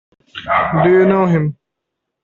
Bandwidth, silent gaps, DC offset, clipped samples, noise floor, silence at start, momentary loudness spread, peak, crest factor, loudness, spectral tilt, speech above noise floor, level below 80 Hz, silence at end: 6.8 kHz; none; under 0.1%; under 0.1%; -77 dBFS; 0.35 s; 16 LU; -2 dBFS; 14 dB; -14 LUFS; -9 dB/octave; 64 dB; -48 dBFS; 0.7 s